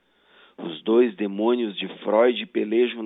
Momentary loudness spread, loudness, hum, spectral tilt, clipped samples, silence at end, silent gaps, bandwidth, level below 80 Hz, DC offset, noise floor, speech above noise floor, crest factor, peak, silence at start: 11 LU; -23 LUFS; none; -8.5 dB/octave; under 0.1%; 0 s; none; 4 kHz; -86 dBFS; under 0.1%; -56 dBFS; 34 dB; 16 dB; -6 dBFS; 0.6 s